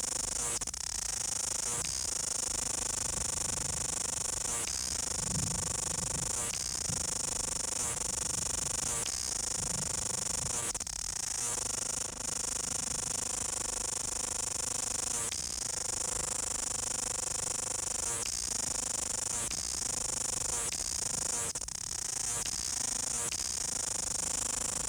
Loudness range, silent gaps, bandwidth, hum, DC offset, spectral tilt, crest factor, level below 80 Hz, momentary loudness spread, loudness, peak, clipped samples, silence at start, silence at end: 1 LU; none; over 20 kHz; none; under 0.1%; -1 dB/octave; 14 dB; -52 dBFS; 1 LU; -32 LUFS; -20 dBFS; under 0.1%; 0 s; 0 s